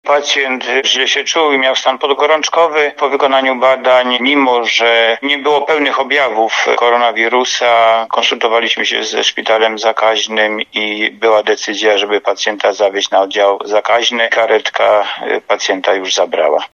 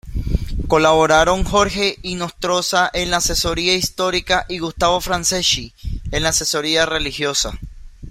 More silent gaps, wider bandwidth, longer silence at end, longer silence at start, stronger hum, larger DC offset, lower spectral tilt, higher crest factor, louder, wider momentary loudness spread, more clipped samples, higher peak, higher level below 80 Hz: neither; second, 7.6 kHz vs 16.5 kHz; about the same, 0.1 s vs 0 s; about the same, 0.05 s vs 0.05 s; neither; neither; second, -1 dB/octave vs -2.5 dB/octave; second, 12 dB vs 18 dB; first, -12 LUFS vs -17 LUFS; second, 4 LU vs 10 LU; neither; about the same, 0 dBFS vs 0 dBFS; second, -74 dBFS vs -30 dBFS